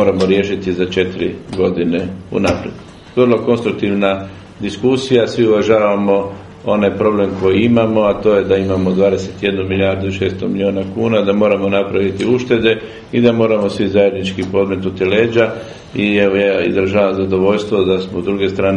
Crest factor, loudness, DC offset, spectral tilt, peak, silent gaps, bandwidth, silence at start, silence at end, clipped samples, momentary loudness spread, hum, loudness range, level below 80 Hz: 14 dB; -15 LUFS; under 0.1%; -7 dB/octave; 0 dBFS; none; 10.5 kHz; 0 s; 0 s; under 0.1%; 7 LU; none; 3 LU; -46 dBFS